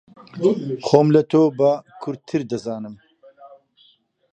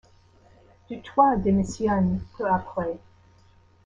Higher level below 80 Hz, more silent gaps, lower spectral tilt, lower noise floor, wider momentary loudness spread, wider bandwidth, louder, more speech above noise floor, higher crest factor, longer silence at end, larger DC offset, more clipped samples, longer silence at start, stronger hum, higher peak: second, -66 dBFS vs -48 dBFS; neither; about the same, -7.5 dB/octave vs -7.5 dB/octave; about the same, -58 dBFS vs -57 dBFS; about the same, 16 LU vs 17 LU; about the same, 8.8 kHz vs 9 kHz; first, -19 LUFS vs -24 LUFS; first, 39 dB vs 33 dB; about the same, 20 dB vs 20 dB; about the same, 0.85 s vs 0.9 s; neither; neither; second, 0.35 s vs 0.9 s; neither; first, 0 dBFS vs -6 dBFS